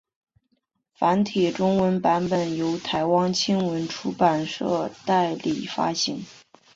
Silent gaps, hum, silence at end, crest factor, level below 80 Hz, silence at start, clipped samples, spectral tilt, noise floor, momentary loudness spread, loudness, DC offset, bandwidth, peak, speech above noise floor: none; none; 0.4 s; 18 dB; -62 dBFS; 1 s; under 0.1%; -5 dB/octave; -72 dBFS; 6 LU; -24 LUFS; under 0.1%; 7.8 kHz; -6 dBFS; 49 dB